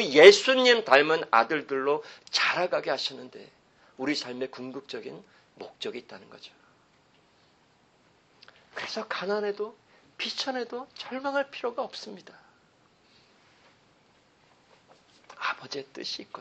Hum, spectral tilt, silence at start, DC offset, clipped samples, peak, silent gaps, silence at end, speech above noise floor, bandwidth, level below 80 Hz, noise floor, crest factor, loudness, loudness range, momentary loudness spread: none; -2.5 dB/octave; 0 s; under 0.1%; under 0.1%; -2 dBFS; none; 0 s; 38 dB; 8.4 kHz; -78 dBFS; -64 dBFS; 28 dB; -26 LUFS; 18 LU; 22 LU